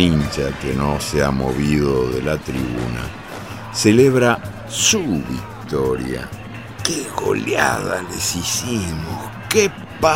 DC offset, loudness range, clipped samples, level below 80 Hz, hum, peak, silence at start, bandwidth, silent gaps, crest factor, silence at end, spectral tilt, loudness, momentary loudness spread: 0.3%; 3 LU; under 0.1%; -36 dBFS; none; 0 dBFS; 0 s; 16.5 kHz; none; 20 dB; 0 s; -4 dB/octave; -19 LUFS; 13 LU